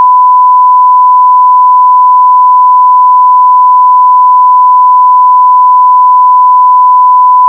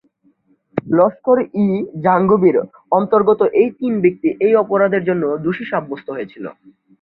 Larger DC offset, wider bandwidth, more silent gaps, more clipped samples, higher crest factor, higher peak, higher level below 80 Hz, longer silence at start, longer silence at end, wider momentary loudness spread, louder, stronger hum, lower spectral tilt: neither; second, 1.1 kHz vs 4.2 kHz; neither; first, 0.5% vs under 0.1%; second, 4 dB vs 14 dB; about the same, 0 dBFS vs -2 dBFS; second, under -90 dBFS vs -58 dBFS; second, 0 s vs 0.75 s; second, 0 s vs 0.5 s; second, 0 LU vs 13 LU; first, -3 LUFS vs -16 LUFS; neither; second, 8.5 dB/octave vs -11.5 dB/octave